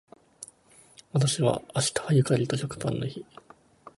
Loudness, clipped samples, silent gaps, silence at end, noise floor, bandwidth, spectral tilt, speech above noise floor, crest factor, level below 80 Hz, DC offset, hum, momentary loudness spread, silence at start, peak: -27 LUFS; under 0.1%; none; 0.1 s; -57 dBFS; 11.5 kHz; -5 dB/octave; 31 dB; 20 dB; -60 dBFS; under 0.1%; none; 22 LU; 0.4 s; -10 dBFS